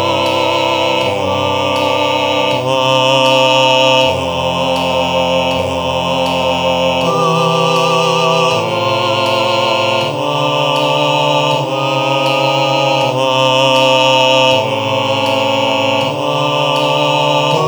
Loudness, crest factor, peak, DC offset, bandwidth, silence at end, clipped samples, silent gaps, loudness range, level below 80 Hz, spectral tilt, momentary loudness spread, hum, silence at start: -12 LUFS; 12 dB; 0 dBFS; under 0.1%; over 20 kHz; 0 s; under 0.1%; none; 2 LU; -50 dBFS; -4 dB/octave; 6 LU; none; 0 s